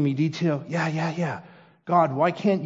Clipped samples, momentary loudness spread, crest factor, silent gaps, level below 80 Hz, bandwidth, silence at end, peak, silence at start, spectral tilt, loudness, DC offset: under 0.1%; 8 LU; 18 dB; none; -72 dBFS; 7.8 kHz; 0 s; -6 dBFS; 0 s; -7.5 dB/octave; -24 LUFS; under 0.1%